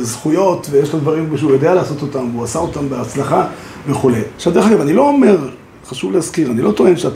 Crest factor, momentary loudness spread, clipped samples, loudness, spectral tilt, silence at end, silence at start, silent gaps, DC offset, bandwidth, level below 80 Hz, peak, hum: 14 dB; 9 LU; under 0.1%; -14 LUFS; -6.5 dB/octave; 0 s; 0 s; none; under 0.1%; 15.5 kHz; -46 dBFS; 0 dBFS; none